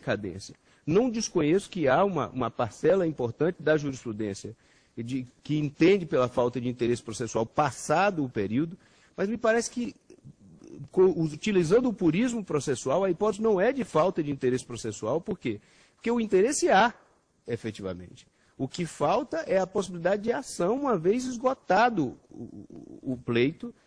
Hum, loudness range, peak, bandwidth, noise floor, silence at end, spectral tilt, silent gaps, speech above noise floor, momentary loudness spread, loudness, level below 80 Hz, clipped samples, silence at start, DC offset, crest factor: none; 3 LU; -10 dBFS; 10.5 kHz; -52 dBFS; 0.15 s; -5.5 dB/octave; none; 25 dB; 14 LU; -27 LUFS; -60 dBFS; under 0.1%; 0 s; under 0.1%; 18 dB